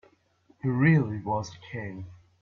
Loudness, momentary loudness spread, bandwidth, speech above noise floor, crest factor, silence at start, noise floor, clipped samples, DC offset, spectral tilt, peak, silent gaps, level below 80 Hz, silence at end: -27 LUFS; 19 LU; 7 kHz; 38 dB; 18 dB; 0.65 s; -64 dBFS; under 0.1%; under 0.1%; -8 dB/octave; -10 dBFS; none; -62 dBFS; 0.25 s